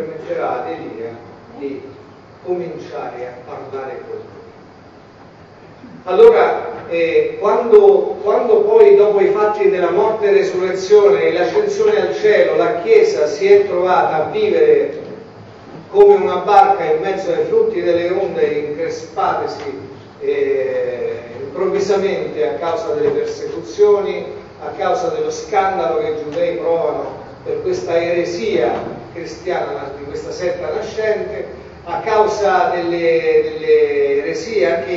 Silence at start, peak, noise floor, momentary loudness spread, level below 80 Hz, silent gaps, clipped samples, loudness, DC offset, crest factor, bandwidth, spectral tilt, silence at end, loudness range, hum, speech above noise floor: 0 s; 0 dBFS; -41 dBFS; 17 LU; -52 dBFS; none; 0.1%; -15 LUFS; under 0.1%; 16 dB; 7.6 kHz; -5.5 dB/octave; 0 s; 13 LU; none; 26 dB